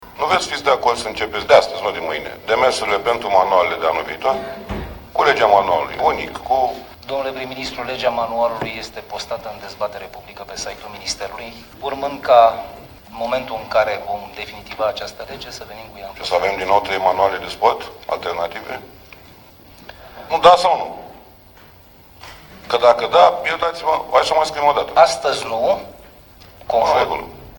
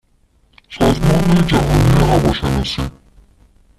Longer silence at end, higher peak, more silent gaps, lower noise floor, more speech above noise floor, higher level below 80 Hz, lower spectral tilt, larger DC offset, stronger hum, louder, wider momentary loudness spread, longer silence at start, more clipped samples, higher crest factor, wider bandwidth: second, 0 s vs 0.9 s; about the same, 0 dBFS vs -2 dBFS; neither; second, -45 dBFS vs -56 dBFS; second, 27 dB vs 42 dB; second, -46 dBFS vs -26 dBFS; second, -3 dB/octave vs -6.5 dB/octave; neither; neither; second, -18 LUFS vs -15 LUFS; first, 18 LU vs 11 LU; second, 0 s vs 0.7 s; neither; first, 20 dB vs 14 dB; first, 17.5 kHz vs 14 kHz